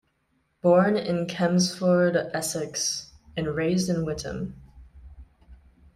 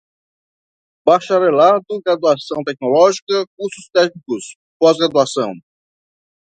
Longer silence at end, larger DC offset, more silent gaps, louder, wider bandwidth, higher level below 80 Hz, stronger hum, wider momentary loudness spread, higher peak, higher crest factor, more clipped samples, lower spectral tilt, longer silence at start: second, 0.4 s vs 1 s; neither; second, none vs 3.22-3.27 s, 3.47-3.57 s, 4.55-4.80 s; second, -25 LUFS vs -16 LUFS; first, 15 kHz vs 9.4 kHz; first, -52 dBFS vs -68 dBFS; neither; about the same, 13 LU vs 13 LU; second, -8 dBFS vs 0 dBFS; about the same, 18 dB vs 16 dB; neither; about the same, -5 dB/octave vs -4.5 dB/octave; second, 0.65 s vs 1.05 s